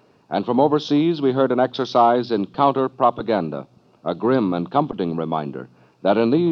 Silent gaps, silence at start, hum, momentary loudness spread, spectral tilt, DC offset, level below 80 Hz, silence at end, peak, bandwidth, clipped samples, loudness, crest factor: none; 0.3 s; none; 10 LU; -8 dB/octave; under 0.1%; -62 dBFS; 0 s; -2 dBFS; 6.6 kHz; under 0.1%; -20 LUFS; 18 dB